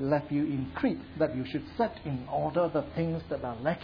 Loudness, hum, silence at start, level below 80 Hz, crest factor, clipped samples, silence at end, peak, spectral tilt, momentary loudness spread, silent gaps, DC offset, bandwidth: -31 LUFS; none; 0 s; -54 dBFS; 18 dB; under 0.1%; 0 s; -14 dBFS; -10 dB/octave; 6 LU; none; under 0.1%; 5.2 kHz